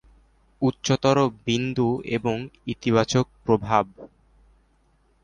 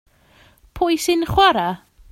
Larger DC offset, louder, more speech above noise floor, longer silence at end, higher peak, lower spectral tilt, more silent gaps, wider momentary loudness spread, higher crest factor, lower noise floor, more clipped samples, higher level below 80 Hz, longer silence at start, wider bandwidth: neither; second, -24 LUFS vs -18 LUFS; first, 40 dB vs 36 dB; first, 1.2 s vs 0.35 s; second, -4 dBFS vs 0 dBFS; first, -5.5 dB/octave vs -4 dB/octave; neither; second, 8 LU vs 11 LU; about the same, 20 dB vs 20 dB; first, -63 dBFS vs -53 dBFS; neither; second, -52 dBFS vs -42 dBFS; second, 0.6 s vs 0.75 s; second, 10 kHz vs 16.5 kHz